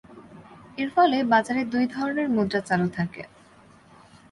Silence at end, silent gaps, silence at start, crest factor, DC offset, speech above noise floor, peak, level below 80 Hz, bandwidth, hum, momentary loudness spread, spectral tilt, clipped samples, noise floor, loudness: 1.05 s; none; 0.1 s; 18 dB; under 0.1%; 30 dB; -8 dBFS; -62 dBFS; 11.5 kHz; none; 13 LU; -6.5 dB/octave; under 0.1%; -53 dBFS; -24 LUFS